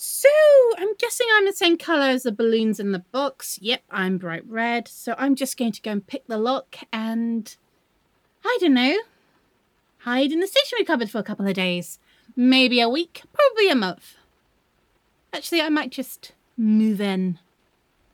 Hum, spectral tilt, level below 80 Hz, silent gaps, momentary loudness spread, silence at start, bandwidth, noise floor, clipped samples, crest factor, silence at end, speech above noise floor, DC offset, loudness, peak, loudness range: none; -4 dB/octave; -76 dBFS; none; 14 LU; 0 s; 20 kHz; -66 dBFS; under 0.1%; 20 dB; 0.75 s; 44 dB; under 0.1%; -21 LUFS; -2 dBFS; 5 LU